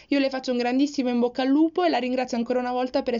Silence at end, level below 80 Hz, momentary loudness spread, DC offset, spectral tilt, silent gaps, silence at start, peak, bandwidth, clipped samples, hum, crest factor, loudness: 0 s; -62 dBFS; 4 LU; under 0.1%; -2.5 dB/octave; none; 0.1 s; -12 dBFS; 7.6 kHz; under 0.1%; none; 12 dB; -24 LUFS